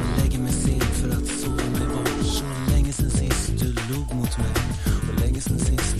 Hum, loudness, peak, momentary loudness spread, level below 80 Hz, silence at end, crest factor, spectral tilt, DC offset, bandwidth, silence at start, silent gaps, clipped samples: none; -24 LUFS; -8 dBFS; 3 LU; -26 dBFS; 0 s; 14 dB; -5 dB/octave; under 0.1%; 15.5 kHz; 0 s; none; under 0.1%